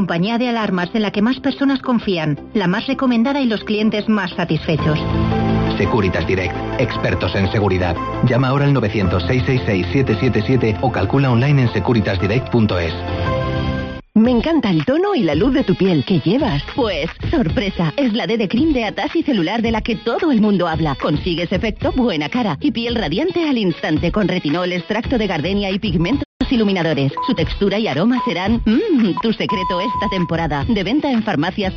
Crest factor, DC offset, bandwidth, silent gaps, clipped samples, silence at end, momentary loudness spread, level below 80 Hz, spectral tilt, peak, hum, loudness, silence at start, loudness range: 14 dB; under 0.1%; 6.8 kHz; 26.25-26.40 s; under 0.1%; 0 s; 4 LU; -34 dBFS; -5.5 dB/octave; -2 dBFS; none; -17 LUFS; 0 s; 2 LU